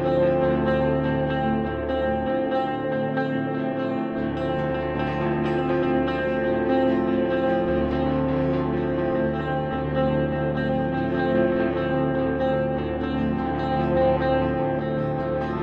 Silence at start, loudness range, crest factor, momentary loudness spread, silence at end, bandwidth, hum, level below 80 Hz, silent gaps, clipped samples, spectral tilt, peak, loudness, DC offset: 0 s; 2 LU; 14 dB; 5 LU; 0 s; 5.6 kHz; none; -40 dBFS; none; under 0.1%; -9.5 dB/octave; -10 dBFS; -24 LUFS; under 0.1%